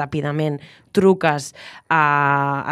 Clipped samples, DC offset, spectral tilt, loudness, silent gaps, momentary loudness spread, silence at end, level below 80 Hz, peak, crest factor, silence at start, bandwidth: under 0.1%; under 0.1%; -6 dB/octave; -19 LUFS; none; 15 LU; 0 s; -58 dBFS; -2 dBFS; 18 dB; 0 s; 13 kHz